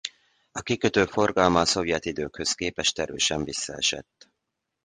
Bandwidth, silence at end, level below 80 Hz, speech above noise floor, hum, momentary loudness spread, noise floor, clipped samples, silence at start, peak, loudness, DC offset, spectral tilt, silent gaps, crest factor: 10.5 kHz; 0.85 s; -50 dBFS; 56 dB; none; 12 LU; -82 dBFS; under 0.1%; 0.05 s; -4 dBFS; -24 LUFS; under 0.1%; -3 dB/octave; none; 24 dB